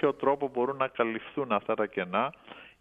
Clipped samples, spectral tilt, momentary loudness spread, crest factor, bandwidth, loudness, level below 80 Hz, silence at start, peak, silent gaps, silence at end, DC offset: under 0.1%; -8 dB/octave; 6 LU; 20 dB; 3.9 kHz; -30 LUFS; -72 dBFS; 0 s; -10 dBFS; none; 0.1 s; under 0.1%